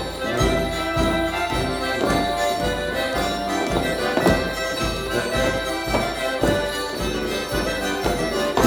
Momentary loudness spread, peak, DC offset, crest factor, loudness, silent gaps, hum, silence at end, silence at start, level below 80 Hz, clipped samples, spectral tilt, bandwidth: 4 LU; -4 dBFS; under 0.1%; 18 dB; -22 LUFS; none; none; 0 s; 0 s; -34 dBFS; under 0.1%; -4.5 dB/octave; 18.5 kHz